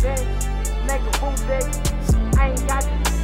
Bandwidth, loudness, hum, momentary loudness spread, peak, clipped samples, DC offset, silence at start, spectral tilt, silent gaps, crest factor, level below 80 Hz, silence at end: 16.5 kHz; -22 LUFS; none; 5 LU; -6 dBFS; under 0.1%; under 0.1%; 0 s; -5 dB/octave; none; 14 dB; -22 dBFS; 0 s